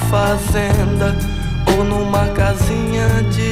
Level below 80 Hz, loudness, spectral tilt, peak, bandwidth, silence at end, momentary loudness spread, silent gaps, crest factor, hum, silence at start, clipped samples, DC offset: -24 dBFS; -16 LUFS; -6 dB/octave; -2 dBFS; 16 kHz; 0 s; 3 LU; none; 14 dB; none; 0 s; under 0.1%; under 0.1%